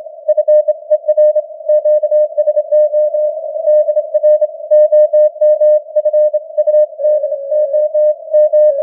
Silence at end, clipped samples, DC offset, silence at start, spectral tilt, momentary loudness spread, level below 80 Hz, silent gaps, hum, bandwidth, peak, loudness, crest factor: 0 s; under 0.1%; under 0.1%; 0 s; -5.5 dB/octave; 6 LU; under -90 dBFS; none; none; 1.9 kHz; -2 dBFS; -12 LUFS; 10 dB